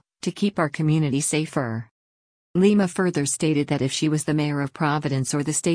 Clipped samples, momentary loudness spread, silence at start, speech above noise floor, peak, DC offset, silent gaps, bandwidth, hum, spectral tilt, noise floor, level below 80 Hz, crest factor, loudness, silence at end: under 0.1%; 7 LU; 0.25 s; over 68 dB; -6 dBFS; under 0.1%; 1.91-2.54 s; 10.5 kHz; none; -5 dB/octave; under -90 dBFS; -58 dBFS; 16 dB; -23 LUFS; 0 s